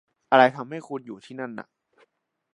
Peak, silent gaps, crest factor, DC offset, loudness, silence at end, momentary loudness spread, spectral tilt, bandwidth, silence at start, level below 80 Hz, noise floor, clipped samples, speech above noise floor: -2 dBFS; none; 24 dB; under 0.1%; -22 LUFS; 0.95 s; 19 LU; -6 dB/octave; 10.5 kHz; 0.3 s; -82 dBFS; -67 dBFS; under 0.1%; 43 dB